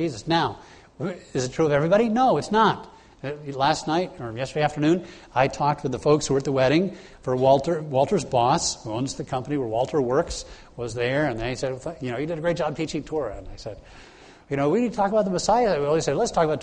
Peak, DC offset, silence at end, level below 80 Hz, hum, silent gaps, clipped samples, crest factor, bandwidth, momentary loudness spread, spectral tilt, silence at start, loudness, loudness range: -6 dBFS; under 0.1%; 0 s; -48 dBFS; none; none; under 0.1%; 18 dB; 10 kHz; 13 LU; -5 dB/octave; 0 s; -24 LUFS; 5 LU